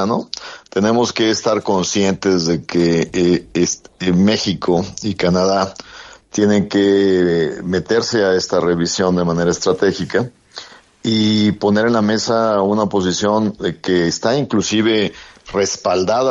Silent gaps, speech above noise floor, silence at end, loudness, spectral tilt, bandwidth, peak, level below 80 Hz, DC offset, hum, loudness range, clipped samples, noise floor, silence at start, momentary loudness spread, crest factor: none; 22 dB; 0 s; -16 LUFS; -5 dB/octave; 7.8 kHz; -2 dBFS; -50 dBFS; under 0.1%; none; 2 LU; under 0.1%; -37 dBFS; 0 s; 8 LU; 14 dB